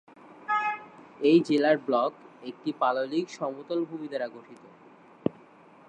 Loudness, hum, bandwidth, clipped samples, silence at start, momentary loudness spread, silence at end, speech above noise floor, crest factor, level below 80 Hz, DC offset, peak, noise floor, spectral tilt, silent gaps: -28 LUFS; none; 9 kHz; under 0.1%; 0.3 s; 16 LU; 0.6 s; 27 dB; 20 dB; -76 dBFS; under 0.1%; -8 dBFS; -54 dBFS; -6 dB/octave; none